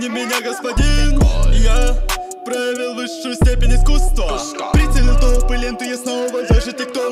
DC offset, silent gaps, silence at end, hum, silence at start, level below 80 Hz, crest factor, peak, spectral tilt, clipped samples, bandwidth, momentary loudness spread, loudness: under 0.1%; none; 0 s; none; 0 s; -14 dBFS; 12 dB; -2 dBFS; -5 dB/octave; under 0.1%; 14.5 kHz; 7 LU; -18 LUFS